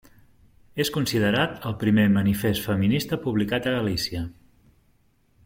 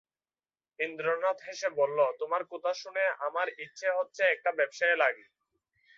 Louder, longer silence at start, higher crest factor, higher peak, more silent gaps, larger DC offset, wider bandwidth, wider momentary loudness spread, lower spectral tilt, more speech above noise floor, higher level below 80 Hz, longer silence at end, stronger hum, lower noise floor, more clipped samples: first, -24 LUFS vs -30 LUFS; about the same, 0.75 s vs 0.8 s; about the same, 18 dB vs 20 dB; first, -6 dBFS vs -12 dBFS; neither; neither; first, 16.5 kHz vs 7.6 kHz; about the same, 8 LU vs 7 LU; first, -5.5 dB/octave vs -2.5 dB/octave; second, 40 dB vs over 60 dB; first, -50 dBFS vs -88 dBFS; first, 1.15 s vs 0.8 s; neither; second, -63 dBFS vs under -90 dBFS; neither